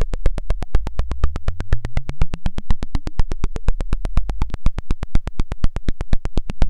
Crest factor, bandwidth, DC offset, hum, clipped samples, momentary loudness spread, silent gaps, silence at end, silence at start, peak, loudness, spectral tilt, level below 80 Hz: 12 dB; 6.4 kHz; under 0.1%; none; under 0.1%; 3 LU; none; 0 s; 0 s; -2 dBFS; -27 LUFS; -7 dB/octave; -20 dBFS